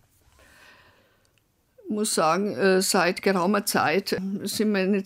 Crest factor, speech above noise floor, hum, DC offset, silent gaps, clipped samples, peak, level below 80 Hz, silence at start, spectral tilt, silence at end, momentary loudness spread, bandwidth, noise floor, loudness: 18 dB; 44 dB; none; under 0.1%; none; under 0.1%; -8 dBFS; -66 dBFS; 1.85 s; -4 dB/octave; 0 s; 8 LU; 16 kHz; -67 dBFS; -23 LUFS